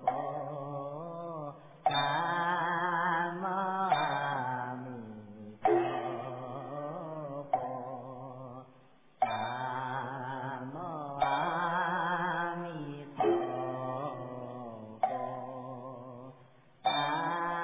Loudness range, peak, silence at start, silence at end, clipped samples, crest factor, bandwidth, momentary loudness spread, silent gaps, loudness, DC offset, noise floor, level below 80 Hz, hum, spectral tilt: 7 LU; -16 dBFS; 0 s; 0 s; under 0.1%; 18 dB; 3.9 kHz; 15 LU; none; -34 LUFS; under 0.1%; -62 dBFS; -74 dBFS; none; -3.5 dB/octave